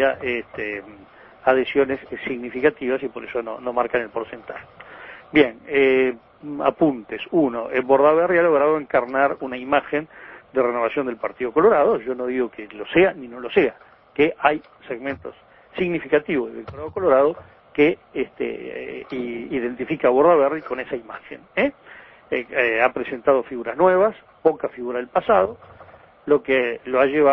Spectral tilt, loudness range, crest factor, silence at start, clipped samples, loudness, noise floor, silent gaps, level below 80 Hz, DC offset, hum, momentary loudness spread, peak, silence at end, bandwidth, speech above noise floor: -9 dB/octave; 4 LU; 20 dB; 0 s; under 0.1%; -21 LUFS; -47 dBFS; none; -56 dBFS; under 0.1%; none; 15 LU; 0 dBFS; 0 s; 5.6 kHz; 26 dB